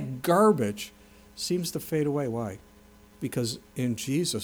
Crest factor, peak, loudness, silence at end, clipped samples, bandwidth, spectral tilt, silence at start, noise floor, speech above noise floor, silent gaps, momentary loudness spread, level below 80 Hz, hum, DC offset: 18 dB; -10 dBFS; -28 LUFS; 0 s; under 0.1%; over 20 kHz; -5 dB/octave; 0 s; -54 dBFS; 27 dB; none; 16 LU; -60 dBFS; none; under 0.1%